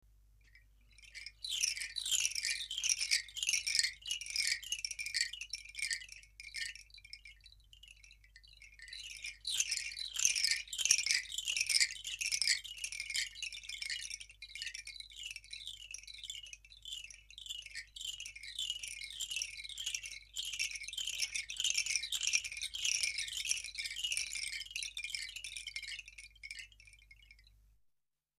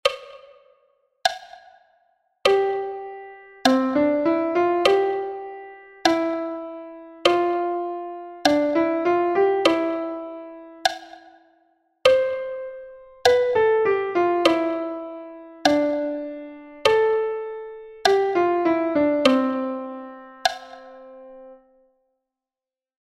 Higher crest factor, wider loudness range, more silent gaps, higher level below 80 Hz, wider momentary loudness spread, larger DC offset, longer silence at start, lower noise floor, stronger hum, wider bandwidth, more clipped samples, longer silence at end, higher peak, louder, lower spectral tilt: first, 32 dB vs 22 dB; first, 13 LU vs 5 LU; neither; second, -66 dBFS vs -60 dBFS; about the same, 17 LU vs 19 LU; neither; first, 0.45 s vs 0.05 s; second, -82 dBFS vs under -90 dBFS; neither; about the same, 15.5 kHz vs 15.5 kHz; neither; second, 0.9 s vs 1.6 s; second, -10 dBFS vs -2 dBFS; second, -36 LUFS vs -22 LUFS; second, 4 dB/octave vs -3.5 dB/octave